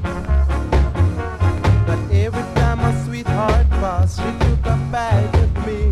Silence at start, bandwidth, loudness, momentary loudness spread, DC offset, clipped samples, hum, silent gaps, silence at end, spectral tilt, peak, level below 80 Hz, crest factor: 0 s; 11 kHz; -18 LUFS; 4 LU; under 0.1%; under 0.1%; none; none; 0 s; -7.5 dB/octave; -2 dBFS; -20 dBFS; 14 dB